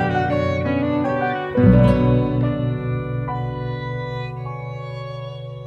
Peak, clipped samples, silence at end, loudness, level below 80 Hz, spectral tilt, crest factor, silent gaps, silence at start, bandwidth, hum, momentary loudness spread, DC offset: -2 dBFS; under 0.1%; 0 s; -21 LUFS; -34 dBFS; -9.5 dB/octave; 18 dB; none; 0 s; 6.4 kHz; none; 16 LU; under 0.1%